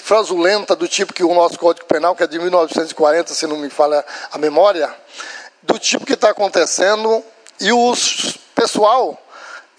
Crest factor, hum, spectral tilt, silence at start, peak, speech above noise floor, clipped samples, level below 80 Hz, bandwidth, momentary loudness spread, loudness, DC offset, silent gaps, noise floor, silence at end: 16 dB; none; -2 dB/octave; 0 s; 0 dBFS; 21 dB; under 0.1%; -70 dBFS; 10.5 kHz; 10 LU; -15 LUFS; under 0.1%; none; -37 dBFS; 0.2 s